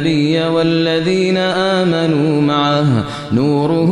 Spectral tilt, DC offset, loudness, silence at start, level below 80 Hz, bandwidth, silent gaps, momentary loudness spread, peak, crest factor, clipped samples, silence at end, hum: -6.5 dB/octave; under 0.1%; -14 LUFS; 0 s; -50 dBFS; 10.5 kHz; none; 2 LU; -2 dBFS; 12 dB; under 0.1%; 0 s; none